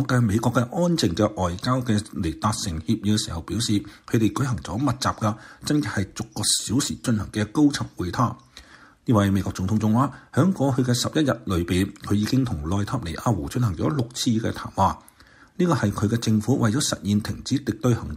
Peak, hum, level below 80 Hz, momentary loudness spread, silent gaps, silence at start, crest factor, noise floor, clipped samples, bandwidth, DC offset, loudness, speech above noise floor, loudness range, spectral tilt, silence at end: -6 dBFS; none; -46 dBFS; 6 LU; none; 0 s; 18 dB; -52 dBFS; under 0.1%; 16 kHz; under 0.1%; -24 LUFS; 29 dB; 2 LU; -5.5 dB/octave; 0 s